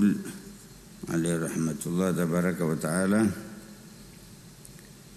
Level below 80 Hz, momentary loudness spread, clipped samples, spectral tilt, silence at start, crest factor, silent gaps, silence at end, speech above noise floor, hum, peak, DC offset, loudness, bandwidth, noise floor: -58 dBFS; 22 LU; under 0.1%; -6 dB/octave; 0 s; 18 dB; none; 0 s; 22 dB; none; -12 dBFS; under 0.1%; -28 LUFS; 13.5 kHz; -49 dBFS